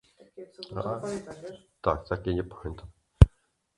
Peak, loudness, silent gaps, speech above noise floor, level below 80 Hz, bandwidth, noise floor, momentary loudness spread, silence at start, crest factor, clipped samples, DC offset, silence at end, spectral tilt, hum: 0 dBFS; -28 LUFS; none; 33 dB; -32 dBFS; 11 kHz; -67 dBFS; 24 LU; 0.4 s; 28 dB; under 0.1%; under 0.1%; 0.5 s; -8 dB/octave; none